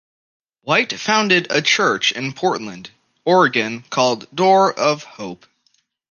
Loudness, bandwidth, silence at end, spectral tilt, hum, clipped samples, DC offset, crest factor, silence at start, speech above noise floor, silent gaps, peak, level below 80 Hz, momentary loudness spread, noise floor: -17 LUFS; 10 kHz; 0.75 s; -3.5 dB/octave; none; under 0.1%; under 0.1%; 18 dB; 0.65 s; 47 dB; none; 0 dBFS; -68 dBFS; 18 LU; -64 dBFS